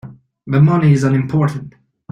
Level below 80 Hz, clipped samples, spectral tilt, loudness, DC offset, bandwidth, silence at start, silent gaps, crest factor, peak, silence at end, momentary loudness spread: -50 dBFS; under 0.1%; -8.5 dB/octave; -14 LUFS; under 0.1%; 9.2 kHz; 0.05 s; none; 14 dB; -2 dBFS; 0.45 s; 8 LU